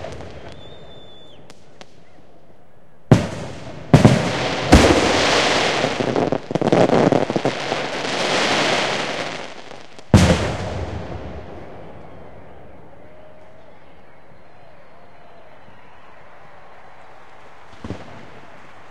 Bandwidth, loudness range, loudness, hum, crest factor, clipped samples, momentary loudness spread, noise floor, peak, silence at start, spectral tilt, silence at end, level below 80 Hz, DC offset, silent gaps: 14 kHz; 19 LU; -17 LUFS; none; 22 dB; under 0.1%; 25 LU; -52 dBFS; 0 dBFS; 0 s; -5 dB/octave; 0.5 s; -36 dBFS; 2%; none